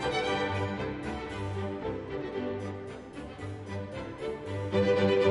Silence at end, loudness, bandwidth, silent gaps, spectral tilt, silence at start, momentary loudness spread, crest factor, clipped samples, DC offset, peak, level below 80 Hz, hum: 0 s; -33 LUFS; 10.5 kHz; none; -6.5 dB/octave; 0 s; 15 LU; 18 dB; under 0.1%; under 0.1%; -14 dBFS; -54 dBFS; none